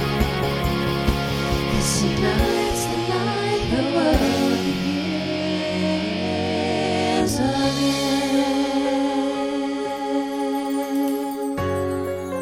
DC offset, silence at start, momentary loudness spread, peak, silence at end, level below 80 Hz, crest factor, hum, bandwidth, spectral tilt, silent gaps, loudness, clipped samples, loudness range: under 0.1%; 0 s; 5 LU; -6 dBFS; 0 s; -34 dBFS; 16 dB; none; 17 kHz; -5 dB/octave; none; -22 LUFS; under 0.1%; 3 LU